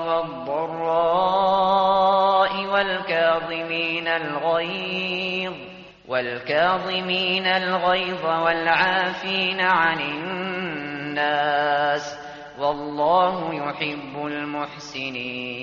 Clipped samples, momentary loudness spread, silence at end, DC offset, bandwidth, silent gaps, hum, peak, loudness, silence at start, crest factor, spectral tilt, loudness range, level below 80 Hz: under 0.1%; 10 LU; 0 s; under 0.1%; 7.2 kHz; none; none; -6 dBFS; -22 LUFS; 0 s; 18 dB; -1.5 dB/octave; 5 LU; -60 dBFS